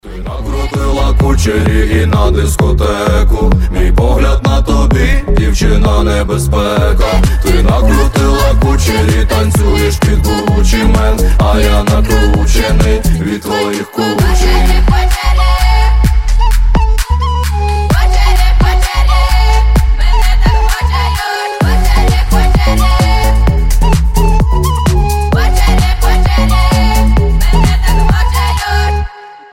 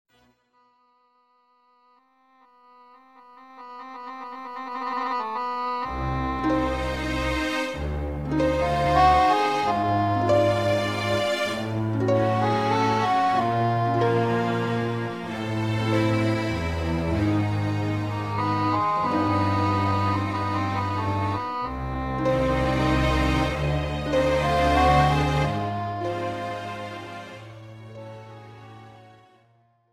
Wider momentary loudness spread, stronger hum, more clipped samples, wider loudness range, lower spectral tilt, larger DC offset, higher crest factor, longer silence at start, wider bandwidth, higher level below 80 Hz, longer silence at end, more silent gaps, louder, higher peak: second, 3 LU vs 16 LU; neither; neither; second, 1 LU vs 11 LU; about the same, -5.5 dB/octave vs -6.5 dB/octave; neither; second, 8 dB vs 18 dB; second, 0.05 s vs 3.35 s; first, 16.5 kHz vs 14 kHz; first, -10 dBFS vs -38 dBFS; second, 0.15 s vs 0.85 s; neither; first, -11 LUFS vs -24 LUFS; first, 0 dBFS vs -6 dBFS